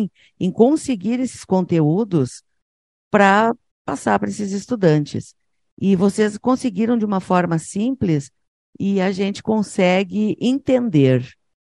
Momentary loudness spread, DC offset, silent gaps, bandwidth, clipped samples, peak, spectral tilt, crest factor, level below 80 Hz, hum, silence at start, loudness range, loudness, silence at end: 9 LU; under 0.1%; 2.62-3.11 s, 3.71-3.85 s, 5.72-5.77 s, 8.48-8.73 s; 11.5 kHz; under 0.1%; 0 dBFS; -6.5 dB/octave; 18 dB; -56 dBFS; none; 0 s; 1 LU; -19 LUFS; 0.4 s